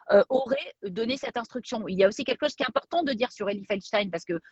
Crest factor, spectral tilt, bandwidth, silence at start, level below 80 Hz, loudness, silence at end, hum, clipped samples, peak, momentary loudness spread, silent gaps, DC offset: 20 dB; -5 dB/octave; 8.2 kHz; 0.05 s; -66 dBFS; -28 LUFS; 0.15 s; none; under 0.1%; -8 dBFS; 9 LU; none; under 0.1%